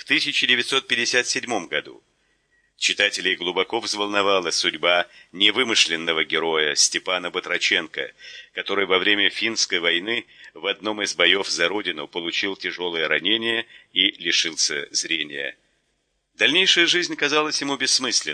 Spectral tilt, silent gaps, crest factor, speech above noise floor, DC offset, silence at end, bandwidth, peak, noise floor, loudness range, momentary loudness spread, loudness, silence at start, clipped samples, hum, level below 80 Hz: -0.5 dB/octave; none; 22 dB; 49 dB; under 0.1%; 0 s; 10.5 kHz; -2 dBFS; -71 dBFS; 3 LU; 10 LU; -20 LUFS; 0.05 s; under 0.1%; none; -72 dBFS